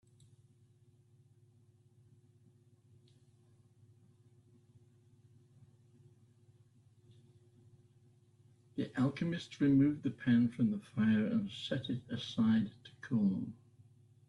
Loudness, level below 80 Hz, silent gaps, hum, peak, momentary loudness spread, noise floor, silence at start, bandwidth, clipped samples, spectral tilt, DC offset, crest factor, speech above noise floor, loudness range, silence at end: -34 LUFS; -72 dBFS; none; none; -20 dBFS; 12 LU; -67 dBFS; 8.75 s; 10.5 kHz; under 0.1%; -7.5 dB/octave; under 0.1%; 18 dB; 34 dB; 10 LU; 0.75 s